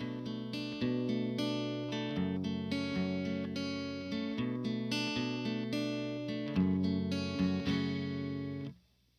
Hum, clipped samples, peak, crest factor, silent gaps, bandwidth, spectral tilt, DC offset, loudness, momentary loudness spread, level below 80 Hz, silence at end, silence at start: none; under 0.1%; -20 dBFS; 16 dB; none; 13 kHz; -6.5 dB/octave; under 0.1%; -36 LUFS; 6 LU; -64 dBFS; 0.45 s; 0 s